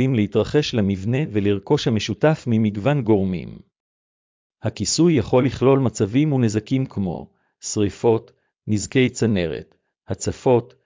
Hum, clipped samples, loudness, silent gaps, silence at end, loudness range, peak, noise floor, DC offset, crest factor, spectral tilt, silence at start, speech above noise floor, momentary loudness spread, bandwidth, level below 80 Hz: none; under 0.1%; -20 LUFS; 3.80-4.50 s; 0.2 s; 3 LU; -4 dBFS; under -90 dBFS; under 0.1%; 16 dB; -6 dB/octave; 0 s; over 70 dB; 10 LU; 7.6 kHz; -46 dBFS